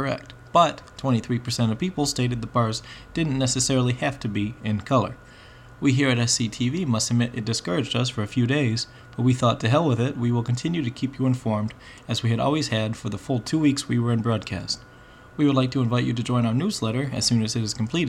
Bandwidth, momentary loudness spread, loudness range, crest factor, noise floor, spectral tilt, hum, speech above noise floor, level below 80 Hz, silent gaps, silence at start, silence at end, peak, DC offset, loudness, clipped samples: 13 kHz; 8 LU; 2 LU; 18 dB; -46 dBFS; -5 dB/octave; none; 23 dB; -52 dBFS; none; 0 s; 0 s; -6 dBFS; under 0.1%; -24 LUFS; under 0.1%